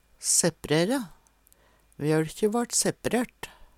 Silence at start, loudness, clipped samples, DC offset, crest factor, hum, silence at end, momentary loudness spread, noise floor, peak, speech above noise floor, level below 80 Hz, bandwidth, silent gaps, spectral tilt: 0.2 s; -26 LUFS; under 0.1%; under 0.1%; 20 dB; none; 0.15 s; 11 LU; -61 dBFS; -8 dBFS; 35 dB; -56 dBFS; 17.5 kHz; none; -3.5 dB/octave